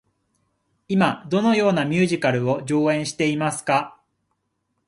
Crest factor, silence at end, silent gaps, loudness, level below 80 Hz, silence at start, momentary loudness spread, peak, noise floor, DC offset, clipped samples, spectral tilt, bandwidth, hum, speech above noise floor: 20 dB; 1 s; none; -21 LUFS; -64 dBFS; 0.9 s; 4 LU; -2 dBFS; -74 dBFS; under 0.1%; under 0.1%; -5.5 dB/octave; 11.5 kHz; none; 53 dB